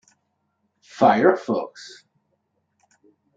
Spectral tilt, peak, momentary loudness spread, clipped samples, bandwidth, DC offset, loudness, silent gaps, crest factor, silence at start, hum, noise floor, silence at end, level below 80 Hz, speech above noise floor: -6 dB/octave; -2 dBFS; 25 LU; under 0.1%; 7.8 kHz; under 0.1%; -19 LUFS; none; 22 dB; 0.95 s; none; -73 dBFS; 1.5 s; -72 dBFS; 53 dB